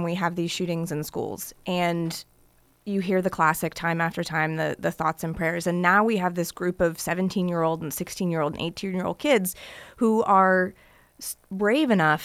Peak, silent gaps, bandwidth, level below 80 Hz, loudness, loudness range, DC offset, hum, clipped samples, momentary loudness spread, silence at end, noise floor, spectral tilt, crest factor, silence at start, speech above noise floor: -6 dBFS; none; 16 kHz; -56 dBFS; -25 LUFS; 3 LU; under 0.1%; none; under 0.1%; 11 LU; 0 s; -60 dBFS; -5 dB/octave; 20 dB; 0 s; 35 dB